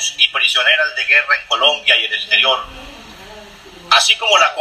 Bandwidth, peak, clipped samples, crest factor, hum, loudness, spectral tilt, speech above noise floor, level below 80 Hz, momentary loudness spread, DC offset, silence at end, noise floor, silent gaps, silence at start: 15 kHz; 0 dBFS; under 0.1%; 16 dB; none; -12 LUFS; 1.5 dB/octave; 24 dB; -50 dBFS; 4 LU; under 0.1%; 0 s; -38 dBFS; none; 0 s